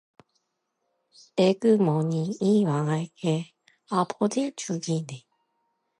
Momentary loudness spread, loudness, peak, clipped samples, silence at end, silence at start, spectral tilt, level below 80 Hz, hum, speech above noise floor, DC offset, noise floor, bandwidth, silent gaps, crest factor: 10 LU; -26 LUFS; -8 dBFS; under 0.1%; 0.8 s; 1.35 s; -6.5 dB/octave; -76 dBFS; none; 53 dB; under 0.1%; -78 dBFS; 11 kHz; none; 18 dB